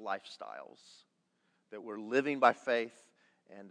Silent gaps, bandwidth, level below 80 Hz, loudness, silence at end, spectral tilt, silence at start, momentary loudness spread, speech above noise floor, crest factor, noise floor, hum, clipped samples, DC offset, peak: none; 10 kHz; under -90 dBFS; -33 LUFS; 0 s; -4.5 dB/octave; 0 s; 23 LU; 43 dB; 24 dB; -77 dBFS; none; under 0.1%; under 0.1%; -12 dBFS